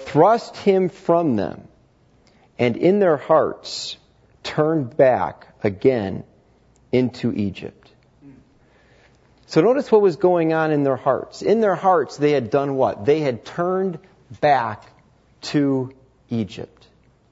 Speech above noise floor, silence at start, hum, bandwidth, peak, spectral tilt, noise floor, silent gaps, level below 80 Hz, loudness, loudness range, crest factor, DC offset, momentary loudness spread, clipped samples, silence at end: 37 dB; 0 s; none; 8 kHz; -2 dBFS; -7 dB/octave; -56 dBFS; none; -60 dBFS; -20 LUFS; 6 LU; 18 dB; under 0.1%; 14 LU; under 0.1%; 0.65 s